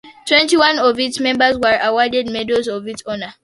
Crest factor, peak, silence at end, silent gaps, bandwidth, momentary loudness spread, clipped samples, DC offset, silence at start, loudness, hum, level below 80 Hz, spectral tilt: 16 dB; 0 dBFS; 0.1 s; none; 11.5 kHz; 13 LU; under 0.1%; under 0.1%; 0.05 s; -15 LUFS; none; -52 dBFS; -2.5 dB/octave